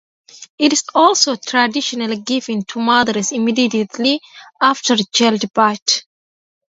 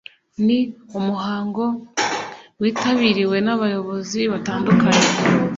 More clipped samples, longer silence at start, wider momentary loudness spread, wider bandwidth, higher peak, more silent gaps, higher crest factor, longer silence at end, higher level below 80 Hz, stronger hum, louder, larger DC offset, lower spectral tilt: neither; about the same, 0.35 s vs 0.4 s; second, 7 LU vs 10 LU; about the same, 8 kHz vs 7.8 kHz; about the same, 0 dBFS vs -2 dBFS; first, 0.50-0.58 s, 5.82-5.86 s vs none; about the same, 16 dB vs 16 dB; first, 0.65 s vs 0 s; second, -64 dBFS vs -56 dBFS; neither; first, -16 LUFS vs -19 LUFS; neither; second, -2.5 dB/octave vs -4.5 dB/octave